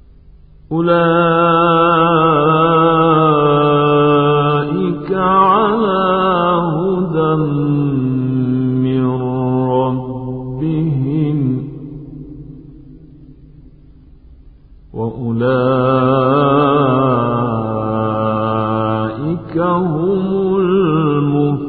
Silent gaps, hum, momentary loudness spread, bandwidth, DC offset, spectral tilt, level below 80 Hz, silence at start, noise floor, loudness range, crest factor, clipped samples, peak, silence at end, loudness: none; none; 10 LU; 4.5 kHz; 0.1%; -13 dB/octave; -42 dBFS; 0.7 s; -42 dBFS; 10 LU; 12 dB; under 0.1%; -2 dBFS; 0 s; -14 LUFS